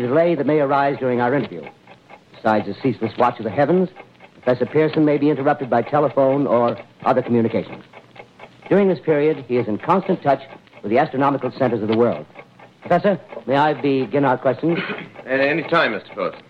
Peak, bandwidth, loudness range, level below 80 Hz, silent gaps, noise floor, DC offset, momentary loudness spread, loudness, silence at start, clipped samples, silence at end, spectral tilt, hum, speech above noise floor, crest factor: -6 dBFS; 7 kHz; 2 LU; -62 dBFS; none; -46 dBFS; under 0.1%; 8 LU; -19 LUFS; 0 s; under 0.1%; 0.1 s; -8.5 dB/octave; none; 27 dB; 14 dB